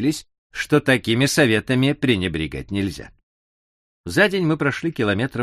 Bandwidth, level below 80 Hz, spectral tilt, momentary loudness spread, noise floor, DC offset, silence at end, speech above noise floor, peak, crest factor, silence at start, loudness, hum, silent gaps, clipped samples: 15 kHz; -46 dBFS; -5 dB/octave; 12 LU; under -90 dBFS; under 0.1%; 0 s; over 70 dB; -4 dBFS; 18 dB; 0 s; -20 LUFS; none; 0.38-0.50 s, 3.23-4.04 s; under 0.1%